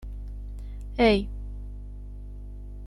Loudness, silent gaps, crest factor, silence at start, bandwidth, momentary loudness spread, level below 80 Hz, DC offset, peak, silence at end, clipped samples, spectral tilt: -25 LUFS; none; 22 dB; 0 s; 11.5 kHz; 21 LU; -36 dBFS; under 0.1%; -8 dBFS; 0 s; under 0.1%; -7 dB/octave